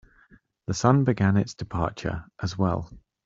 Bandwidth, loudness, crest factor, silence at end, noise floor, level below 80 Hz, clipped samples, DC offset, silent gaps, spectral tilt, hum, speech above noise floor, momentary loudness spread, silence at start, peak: 7.8 kHz; -26 LUFS; 22 dB; 0.25 s; -58 dBFS; -48 dBFS; under 0.1%; under 0.1%; none; -6.5 dB/octave; none; 34 dB; 12 LU; 0.7 s; -4 dBFS